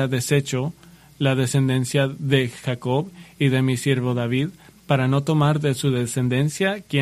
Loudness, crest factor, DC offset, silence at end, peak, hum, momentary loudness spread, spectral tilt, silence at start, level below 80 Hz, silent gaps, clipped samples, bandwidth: -22 LUFS; 18 dB; under 0.1%; 0 s; -2 dBFS; none; 6 LU; -6 dB/octave; 0 s; -56 dBFS; none; under 0.1%; 14 kHz